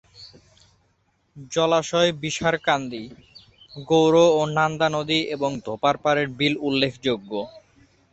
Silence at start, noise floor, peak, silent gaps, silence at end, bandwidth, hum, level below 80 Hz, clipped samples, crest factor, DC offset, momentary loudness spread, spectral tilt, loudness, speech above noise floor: 0.2 s; -67 dBFS; -6 dBFS; none; 0.55 s; 8.2 kHz; none; -58 dBFS; under 0.1%; 18 dB; under 0.1%; 15 LU; -4.5 dB/octave; -22 LUFS; 45 dB